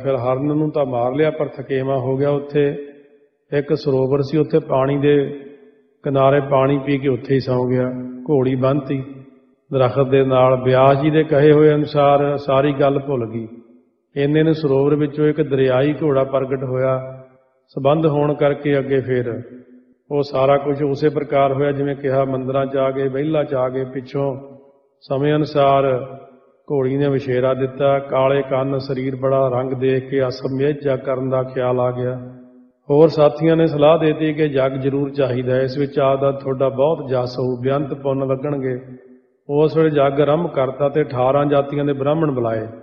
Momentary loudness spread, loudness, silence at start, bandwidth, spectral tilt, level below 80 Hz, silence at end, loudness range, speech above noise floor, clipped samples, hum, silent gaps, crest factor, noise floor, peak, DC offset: 9 LU; -18 LUFS; 0 s; 6.2 kHz; -9.5 dB/octave; -54 dBFS; 0 s; 5 LU; 36 dB; under 0.1%; none; none; 18 dB; -53 dBFS; 0 dBFS; under 0.1%